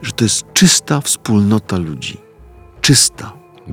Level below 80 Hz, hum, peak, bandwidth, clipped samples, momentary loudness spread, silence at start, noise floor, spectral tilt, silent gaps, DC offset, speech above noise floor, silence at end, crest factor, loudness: -44 dBFS; none; 0 dBFS; 17 kHz; under 0.1%; 16 LU; 0 s; -41 dBFS; -3.5 dB/octave; none; under 0.1%; 27 dB; 0 s; 16 dB; -13 LUFS